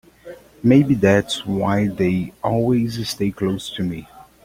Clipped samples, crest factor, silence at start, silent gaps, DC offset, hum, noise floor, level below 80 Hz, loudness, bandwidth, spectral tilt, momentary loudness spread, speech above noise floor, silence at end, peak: under 0.1%; 18 dB; 0.25 s; none; under 0.1%; none; -41 dBFS; -48 dBFS; -19 LUFS; 16.5 kHz; -6.5 dB/octave; 10 LU; 22 dB; 0.25 s; -2 dBFS